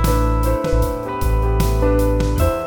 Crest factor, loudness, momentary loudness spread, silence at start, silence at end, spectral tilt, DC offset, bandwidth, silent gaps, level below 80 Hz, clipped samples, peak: 12 dB; -19 LUFS; 4 LU; 0 s; 0 s; -6.5 dB/octave; under 0.1%; 19 kHz; none; -20 dBFS; under 0.1%; -4 dBFS